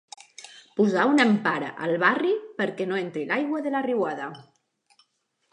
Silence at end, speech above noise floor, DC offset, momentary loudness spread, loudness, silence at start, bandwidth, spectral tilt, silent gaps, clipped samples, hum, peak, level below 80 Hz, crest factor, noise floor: 1.1 s; 49 dB; under 0.1%; 17 LU; -24 LUFS; 0.4 s; 10.5 kHz; -5.5 dB/octave; none; under 0.1%; none; -6 dBFS; -78 dBFS; 20 dB; -73 dBFS